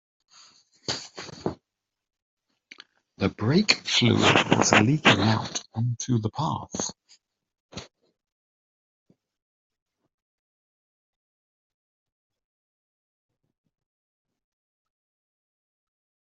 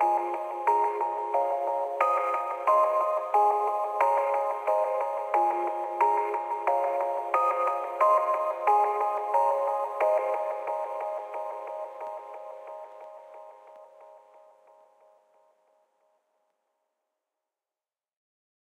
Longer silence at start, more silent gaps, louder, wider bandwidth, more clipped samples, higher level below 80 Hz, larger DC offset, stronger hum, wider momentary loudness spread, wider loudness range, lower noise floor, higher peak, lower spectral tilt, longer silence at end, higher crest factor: first, 0.9 s vs 0 s; first, 2.22-2.37 s, 7.60-7.69 s vs none; first, -23 LUFS vs -27 LUFS; second, 8 kHz vs 15.5 kHz; neither; first, -62 dBFS vs under -90 dBFS; neither; neither; about the same, 17 LU vs 15 LU; about the same, 16 LU vs 15 LU; second, -85 dBFS vs under -90 dBFS; first, -2 dBFS vs -8 dBFS; first, -4 dB/octave vs -2.5 dB/octave; first, 8.5 s vs 4.5 s; first, 28 dB vs 20 dB